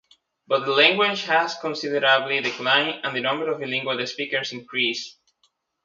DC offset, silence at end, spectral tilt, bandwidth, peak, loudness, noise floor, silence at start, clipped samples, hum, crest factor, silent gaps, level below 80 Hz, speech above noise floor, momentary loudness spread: under 0.1%; 0.75 s; -3 dB/octave; 7.6 kHz; -2 dBFS; -22 LUFS; -68 dBFS; 0.5 s; under 0.1%; none; 22 dB; none; -76 dBFS; 45 dB; 10 LU